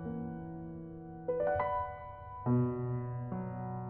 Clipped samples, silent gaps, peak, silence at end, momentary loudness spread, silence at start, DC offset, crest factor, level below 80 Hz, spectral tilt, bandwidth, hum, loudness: under 0.1%; none; -20 dBFS; 0 s; 14 LU; 0 s; under 0.1%; 16 dB; -58 dBFS; -9.5 dB/octave; 3.2 kHz; none; -37 LUFS